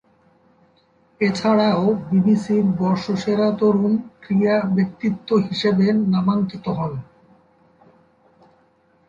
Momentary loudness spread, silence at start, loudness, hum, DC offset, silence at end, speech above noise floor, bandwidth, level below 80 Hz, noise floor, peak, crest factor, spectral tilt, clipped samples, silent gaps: 7 LU; 1.2 s; -19 LUFS; none; under 0.1%; 2.05 s; 40 dB; 7.6 kHz; -58 dBFS; -59 dBFS; -6 dBFS; 16 dB; -7.5 dB/octave; under 0.1%; none